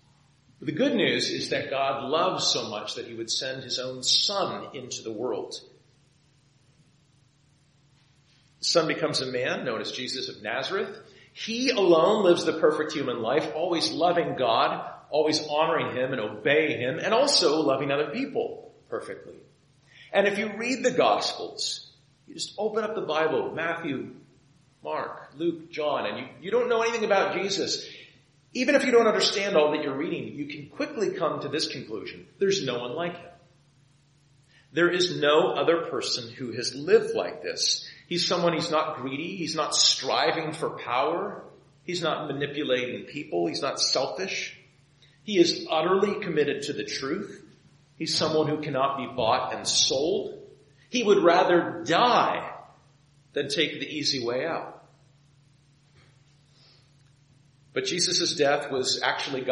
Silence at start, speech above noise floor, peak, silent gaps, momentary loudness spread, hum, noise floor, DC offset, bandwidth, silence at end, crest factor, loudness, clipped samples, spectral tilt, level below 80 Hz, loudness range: 0.6 s; 37 dB; -6 dBFS; none; 14 LU; none; -63 dBFS; under 0.1%; 11 kHz; 0 s; 20 dB; -26 LUFS; under 0.1%; -3 dB/octave; -70 dBFS; 7 LU